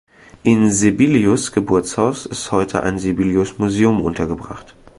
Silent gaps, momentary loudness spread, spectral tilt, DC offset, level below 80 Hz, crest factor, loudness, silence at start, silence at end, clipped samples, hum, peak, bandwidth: none; 10 LU; -5.5 dB/octave; under 0.1%; -42 dBFS; 16 dB; -17 LUFS; 0.45 s; 0.35 s; under 0.1%; none; 0 dBFS; 11.5 kHz